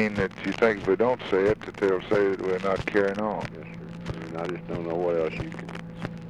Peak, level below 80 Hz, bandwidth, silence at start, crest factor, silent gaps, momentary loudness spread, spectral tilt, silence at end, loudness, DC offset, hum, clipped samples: -10 dBFS; -52 dBFS; 10.5 kHz; 0 s; 16 dB; none; 13 LU; -7 dB/octave; 0 s; -27 LUFS; under 0.1%; none; under 0.1%